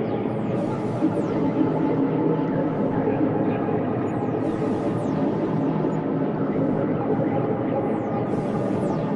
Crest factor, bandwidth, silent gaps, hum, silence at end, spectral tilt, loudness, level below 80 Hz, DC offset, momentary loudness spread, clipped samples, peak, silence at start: 14 dB; 10.5 kHz; none; none; 0 s; -9.5 dB/octave; -24 LUFS; -52 dBFS; under 0.1%; 3 LU; under 0.1%; -10 dBFS; 0 s